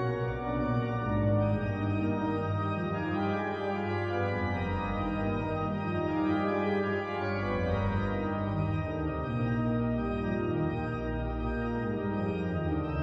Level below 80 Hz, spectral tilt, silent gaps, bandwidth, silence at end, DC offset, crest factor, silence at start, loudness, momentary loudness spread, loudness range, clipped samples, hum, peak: -44 dBFS; -9 dB/octave; none; 6.4 kHz; 0 s; under 0.1%; 14 dB; 0 s; -31 LUFS; 3 LU; 1 LU; under 0.1%; none; -16 dBFS